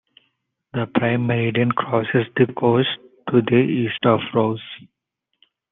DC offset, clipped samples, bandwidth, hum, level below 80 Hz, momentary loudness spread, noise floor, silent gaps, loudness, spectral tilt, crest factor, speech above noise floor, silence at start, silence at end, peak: under 0.1%; under 0.1%; 4 kHz; none; -64 dBFS; 12 LU; -78 dBFS; none; -20 LUFS; -10.5 dB/octave; 18 dB; 59 dB; 0.75 s; 0.95 s; -2 dBFS